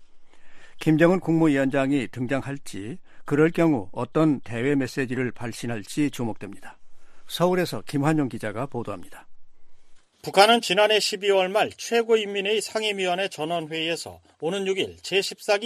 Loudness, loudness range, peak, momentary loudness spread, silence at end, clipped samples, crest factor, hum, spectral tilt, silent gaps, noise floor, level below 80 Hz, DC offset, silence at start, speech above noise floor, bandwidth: -24 LUFS; 7 LU; -2 dBFS; 14 LU; 0 s; under 0.1%; 22 dB; none; -5 dB/octave; none; -44 dBFS; -56 dBFS; under 0.1%; 0 s; 21 dB; 14.5 kHz